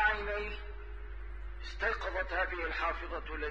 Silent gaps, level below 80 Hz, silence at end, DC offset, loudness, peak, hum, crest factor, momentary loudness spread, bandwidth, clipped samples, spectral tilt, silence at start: none; -44 dBFS; 0 s; 0.3%; -36 LUFS; -18 dBFS; none; 18 dB; 13 LU; 7.4 kHz; under 0.1%; -5.5 dB/octave; 0 s